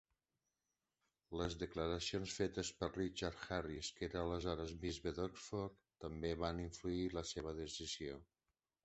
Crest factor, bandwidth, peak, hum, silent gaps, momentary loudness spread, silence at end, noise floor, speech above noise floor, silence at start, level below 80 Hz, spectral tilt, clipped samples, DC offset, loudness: 22 dB; 8.2 kHz; -24 dBFS; none; none; 5 LU; 0.6 s; under -90 dBFS; over 46 dB; 1.3 s; -58 dBFS; -4.5 dB/octave; under 0.1%; under 0.1%; -44 LUFS